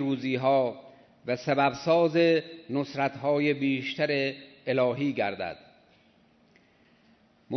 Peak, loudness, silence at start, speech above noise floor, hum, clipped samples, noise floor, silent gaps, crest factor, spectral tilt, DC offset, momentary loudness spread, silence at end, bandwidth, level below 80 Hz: -10 dBFS; -27 LUFS; 0 s; 36 dB; none; under 0.1%; -62 dBFS; none; 18 dB; -6.5 dB/octave; under 0.1%; 12 LU; 0 s; 6.4 kHz; -72 dBFS